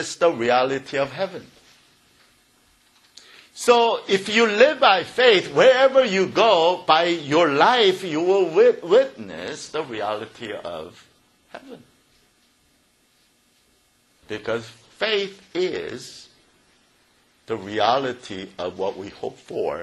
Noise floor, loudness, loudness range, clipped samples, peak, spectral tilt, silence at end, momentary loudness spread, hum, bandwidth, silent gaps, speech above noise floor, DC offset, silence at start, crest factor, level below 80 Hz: -62 dBFS; -20 LUFS; 16 LU; under 0.1%; -2 dBFS; -4 dB/octave; 0 s; 18 LU; none; 12 kHz; none; 42 dB; under 0.1%; 0 s; 20 dB; -66 dBFS